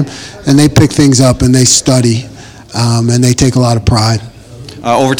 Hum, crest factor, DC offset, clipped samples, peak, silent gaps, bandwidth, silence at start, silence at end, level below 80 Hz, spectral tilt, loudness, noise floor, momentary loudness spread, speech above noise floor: none; 10 dB; under 0.1%; 0.8%; 0 dBFS; none; over 20 kHz; 0 s; 0 s; -30 dBFS; -5 dB/octave; -9 LUFS; -30 dBFS; 13 LU; 21 dB